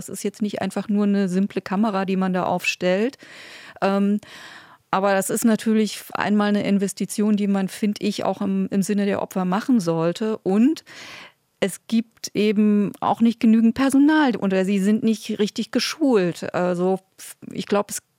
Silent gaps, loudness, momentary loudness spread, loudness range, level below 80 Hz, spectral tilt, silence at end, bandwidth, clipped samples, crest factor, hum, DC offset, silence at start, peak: none; -21 LUFS; 10 LU; 4 LU; -66 dBFS; -5.5 dB/octave; 0.2 s; 16.5 kHz; under 0.1%; 14 dB; none; under 0.1%; 0 s; -6 dBFS